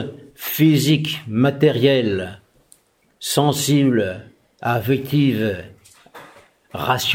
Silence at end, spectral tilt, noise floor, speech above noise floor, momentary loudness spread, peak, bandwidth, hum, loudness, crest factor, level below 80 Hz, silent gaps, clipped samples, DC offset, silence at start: 0 s; -5.5 dB/octave; -56 dBFS; 38 dB; 14 LU; -2 dBFS; 17 kHz; none; -19 LUFS; 18 dB; -58 dBFS; none; under 0.1%; under 0.1%; 0 s